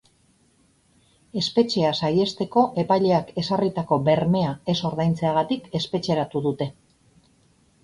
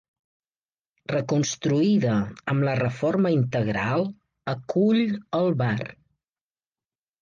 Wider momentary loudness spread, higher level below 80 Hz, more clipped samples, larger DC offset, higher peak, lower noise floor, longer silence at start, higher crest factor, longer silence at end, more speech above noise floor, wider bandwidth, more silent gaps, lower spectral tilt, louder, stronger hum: second, 7 LU vs 11 LU; about the same, -56 dBFS vs -58 dBFS; neither; neither; first, -6 dBFS vs -10 dBFS; second, -62 dBFS vs under -90 dBFS; first, 1.35 s vs 1.1 s; about the same, 18 dB vs 14 dB; second, 1.15 s vs 1.3 s; second, 39 dB vs over 67 dB; first, 11 kHz vs 7.4 kHz; neither; about the same, -6.5 dB/octave vs -6.5 dB/octave; about the same, -23 LUFS vs -24 LUFS; neither